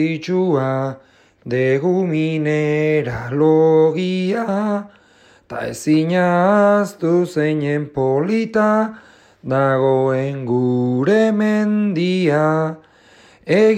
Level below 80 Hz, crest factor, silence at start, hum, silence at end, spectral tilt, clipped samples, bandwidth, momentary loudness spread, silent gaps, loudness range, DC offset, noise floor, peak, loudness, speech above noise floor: -56 dBFS; 14 dB; 0 s; none; 0 s; -7.5 dB/octave; under 0.1%; 14.5 kHz; 10 LU; none; 2 LU; under 0.1%; -51 dBFS; -4 dBFS; -17 LUFS; 34 dB